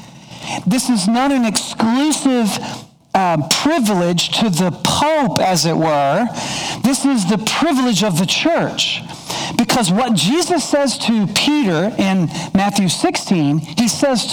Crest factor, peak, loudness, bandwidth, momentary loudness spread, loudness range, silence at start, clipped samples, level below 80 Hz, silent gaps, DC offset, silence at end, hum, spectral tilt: 16 dB; 0 dBFS; -16 LUFS; over 20 kHz; 5 LU; 1 LU; 0 s; under 0.1%; -50 dBFS; none; under 0.1%; 0 s; none; -4 dB/octave